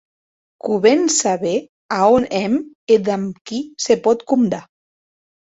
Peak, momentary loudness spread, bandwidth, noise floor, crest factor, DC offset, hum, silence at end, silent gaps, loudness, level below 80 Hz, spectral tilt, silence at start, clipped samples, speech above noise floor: -2 dBFS; 11 LU; 8 kHz; under -90 dBFS; 16 dB; under 0.1%; none; 0.95 s; 1.69-1.89 s, 2.75-2.87 s, 3.41-3.45 s; -18 LUFS; -56 dBFS; -4 dB/octave; 0.65 s; under 0.1%; over 73 dB